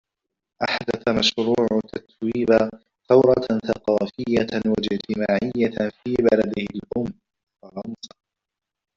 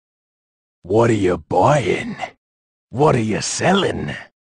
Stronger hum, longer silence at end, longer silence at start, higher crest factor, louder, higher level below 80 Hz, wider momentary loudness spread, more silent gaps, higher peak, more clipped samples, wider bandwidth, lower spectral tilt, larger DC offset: neither; first, 0.9 s vs 0.25 s; second, 0.6 s vs 0.85 s; about the same, 18 dB vs 16 dB; second, -22 LUFS vs -18 LUFS; second, -54 dBFS vs -48 dBFS; about the same, 15 LU vs 15 LU; second, 7.43-7.47 s vs 2.38-2.88 s; about the same, -4 dBFS vs -2 dBFS; neither; second, 7.6 kHz vs 10 kHz; about the same, -5.5 dB/octave vs -5 dB/octave; neither